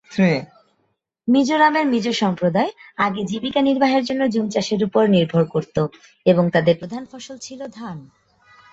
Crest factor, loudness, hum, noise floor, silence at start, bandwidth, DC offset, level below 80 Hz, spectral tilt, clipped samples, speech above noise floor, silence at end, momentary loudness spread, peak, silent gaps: 18 dB; -19 LUFS; none; -70 dBFS; 0.1 s; 8 kHz; under 0.1%; -58 dBFS; -6 dB/octave; under 0.1%; 51 dB; 0.7 s; 17 LU; -2 dBFS; none